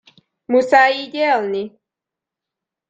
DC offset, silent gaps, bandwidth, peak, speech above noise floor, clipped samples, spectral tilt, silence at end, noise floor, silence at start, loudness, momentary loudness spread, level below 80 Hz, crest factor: under 0.1%; none; 8.4 kHz; -2 dBFS; 70 dB; under 0.1%; -4 dB/octave; 1.2 s; -86 dBFS; 0.5 s; -16 LUFS; 13 LU; -70 dBFS; 18 dB